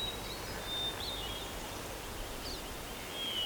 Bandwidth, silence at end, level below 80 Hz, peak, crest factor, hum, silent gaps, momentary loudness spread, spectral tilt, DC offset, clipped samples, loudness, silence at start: over 20 kHz; 0 s; -50 dBFS; -26 dBFS; 14 dB; none; none; 6 LU; -2.5 dB/octave; under 0.1%; under 0.1%; -39 LUFS; 0 s